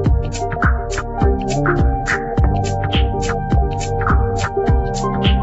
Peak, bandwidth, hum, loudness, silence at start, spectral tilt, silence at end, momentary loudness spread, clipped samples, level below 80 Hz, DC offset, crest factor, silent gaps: -4 dBFS; 8.2 kHz; none; -18 LUFS; 0 s; -6 dB/octave; 0 s; 3 LU; under 0.1%; -20 dBFS; under 0.1%; 14 dB; none